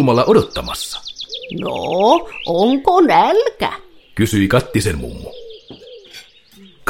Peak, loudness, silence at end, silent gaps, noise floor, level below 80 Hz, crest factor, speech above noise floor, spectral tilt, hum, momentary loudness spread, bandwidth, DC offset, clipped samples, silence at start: 0 dBFS; -16 LUFS; 0.7 s; none; -45 dBFS; -40 dBFS; 16 dB; 30 dB; -5.5 dB/octave; none; 22 LU; 16.5 kHz; under 0.1%; under 0.1%; 0 s